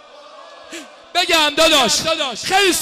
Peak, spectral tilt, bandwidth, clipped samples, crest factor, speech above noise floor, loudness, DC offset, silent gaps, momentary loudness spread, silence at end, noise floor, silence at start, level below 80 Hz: -6 dBFS; -1 dB/octave; 15.5 kHz; under 0.1%; 12 dB; 24 dB; -14 LUFS; under 0.1%; none; 22 LU; 0 s; -40 dBFS; 0.15 s; -48 dBFS